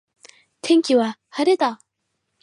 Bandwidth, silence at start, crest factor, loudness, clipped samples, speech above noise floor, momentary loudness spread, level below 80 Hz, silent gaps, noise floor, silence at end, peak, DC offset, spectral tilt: 11.5 kHz; 0.65 s; 16 dB; -20 LUFS; under 0.1%; 57 dB; 13 LU; -78 dBFS; none; -75 dBFS; 0.65 s; -6 dBFS; under 0.1%; -4 dB/octave